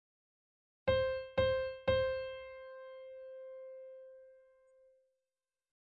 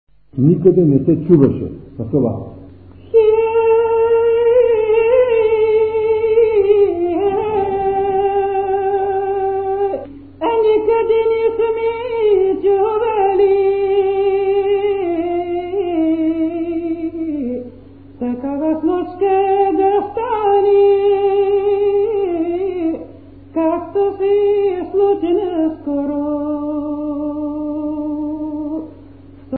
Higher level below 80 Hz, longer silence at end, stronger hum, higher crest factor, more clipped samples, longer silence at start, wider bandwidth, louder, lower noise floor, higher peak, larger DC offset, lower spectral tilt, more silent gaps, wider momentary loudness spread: second, -58 dBFS vs -46 dBFS; first, 1.65 s vs 0 s; neither; about the same, 18 dB vs 16 dB; neither; first, 0.85 s vs 0.35 s; first, 5.2 kHz vs 4.3 kHz; second, -35 LUFS vs -16 LUFS; first, under -90 dBFS vs -39 dBFS; second, -20 dBFS vs 0 dBFS; second, under 0.1% vs 0.4%; second, -7 dB/octave vs -12.5 dB/octave; neither; first, 18 LU vs 10 LU